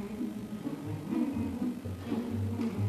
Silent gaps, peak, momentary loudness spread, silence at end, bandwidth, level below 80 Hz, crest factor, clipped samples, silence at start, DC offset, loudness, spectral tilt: none; -20 dBFS; 6 LU; 0 s; 13.5 kHz; -60 dBFS; 14 dB; under 0.1%; 0 s; under 0.1%; -35 LUFS; -8 dB/octave